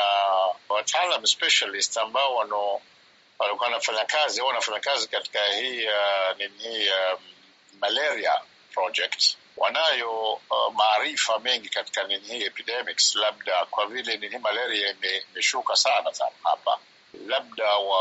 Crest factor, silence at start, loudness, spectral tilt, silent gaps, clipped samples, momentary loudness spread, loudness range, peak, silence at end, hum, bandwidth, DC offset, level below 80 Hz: 20 dB; 0 s; -24 LUFS; 4 dB/octave; none; under 0.1%; 8 LU; 2 LU; -6 dBFS; 0 s; none; 8 kHz; under 0.1%; -86 dBFS